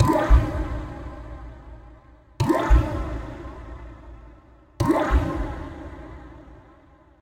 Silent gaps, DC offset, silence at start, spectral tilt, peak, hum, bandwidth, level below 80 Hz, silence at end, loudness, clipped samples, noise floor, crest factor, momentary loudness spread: none; under 0.1%; 0 s; -7.5 dB/octave; -4 dBFS; none; 13.5 kHz; -28 dBFS; 0.65 s; -24 LUFS; under 0.1%; -53 dBFS; 20 dB; 24 LU